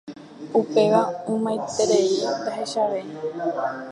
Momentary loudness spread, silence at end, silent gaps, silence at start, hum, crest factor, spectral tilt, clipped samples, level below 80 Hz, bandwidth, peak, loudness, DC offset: 9 LU; 0 s; none; 0.05 s; none; 18 dB; -4.5 dB/octave; under 0.1%; -70 dBFS; 11 kHz; -6 dBFS; -23 LUFS; under 0.1%